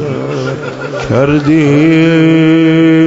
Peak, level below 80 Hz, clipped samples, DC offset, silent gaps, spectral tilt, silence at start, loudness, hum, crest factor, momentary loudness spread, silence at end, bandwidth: 0 dBFS; -40 dBFS; under 0.1%; under 0.1%; none; -7.5 dB/octave; 0 s; -9 LUFS; none; 8 dB; 11 LU; 0 s; 7.8 kHz